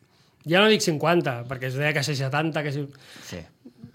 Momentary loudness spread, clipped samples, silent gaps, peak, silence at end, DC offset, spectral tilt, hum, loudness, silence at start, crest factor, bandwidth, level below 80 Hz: 20 LU; under 0.1%; none; -4 dBFS; 0.05 s; under 0.1%; -4.5 dB/octave; none; -23 LUFS; 0.45 s; 22 dB; 16.5 kHz; -64 dBFS